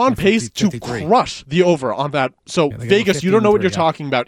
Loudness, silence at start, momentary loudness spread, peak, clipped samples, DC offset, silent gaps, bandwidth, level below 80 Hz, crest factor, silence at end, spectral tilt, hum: -17 LUFS; 0 s; 6 LU; -2 dBFS; under 0.1%; under 0.1%; none; 16 kHz; -46 dBFS; 14 dB; 0.05 s; -5.5 dB/octave; none